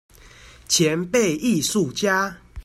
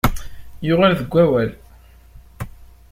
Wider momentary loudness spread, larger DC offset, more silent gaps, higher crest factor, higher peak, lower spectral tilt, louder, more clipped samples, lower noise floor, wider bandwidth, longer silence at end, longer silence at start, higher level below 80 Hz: second, 3 LU vs 19 LU; neither; neither; about the same, 16 dB vs 20 dB; second, -6 dBFS vs 0 dBFS; second, -3.5 dB/octave vs -6.5 dB/octave; second, -21 LUFS vs -18 LUFS; neither; about the same, -47 dBFS vs -46 dBFS; about the same, 16 kHz vs 16.5 kHz; second, 0.05 s vs 0.25 s; first, 0.25 s vs 0.05 s; second, -50 dBFS vs -34 dBFS